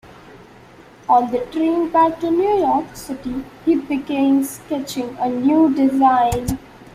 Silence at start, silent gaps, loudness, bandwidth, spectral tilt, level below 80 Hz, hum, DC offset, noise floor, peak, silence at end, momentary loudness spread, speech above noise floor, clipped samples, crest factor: 0.05 s; none; -18 LUFS; 15.5 kHz; -6 dB/octave; -44 dBFS; none; under 0.1%; -44 dBFS; -4 dBFS; 0.05 s; 12 LU; 27 dB; under 0.1%; 14 dB